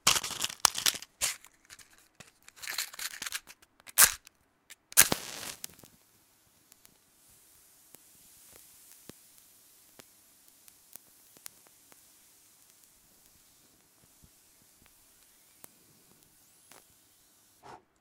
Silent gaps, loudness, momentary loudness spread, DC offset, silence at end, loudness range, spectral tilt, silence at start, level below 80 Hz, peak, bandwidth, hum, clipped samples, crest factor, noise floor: none; -27 LUFS; 31 LU; under 0.1%; 0.25 s; 26 LU; 1 dB/octave; 0.05 s; -66 dBFS; 0 dBFS; 17.5 kHz; none; under 0.1%; 36 dB; -66 dBFS